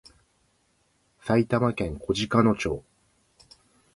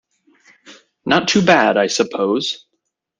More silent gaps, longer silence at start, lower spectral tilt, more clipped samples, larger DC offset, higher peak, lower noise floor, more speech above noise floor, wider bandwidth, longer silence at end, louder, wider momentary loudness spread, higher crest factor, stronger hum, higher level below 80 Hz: neither; first, 1.25 s vs 0.7 s; first, -6.5 dB/octave vs -4 dB/octave; neither; neither; second, -6 dBFS vs 0 dBFS; second, -68 dBFS vs -74 dBFS; second, 44 dB vs 58 dB; first, 11.5 kHz vs 10 kHz; first, 1.15 s vs 0.65 s; second, -25 LUFS vs -16 LUFS; second, 10 LU vs 13 LU; about the same, 22 dB vs 18 dB; neither; first, -50 dBFS vs -58 dBFS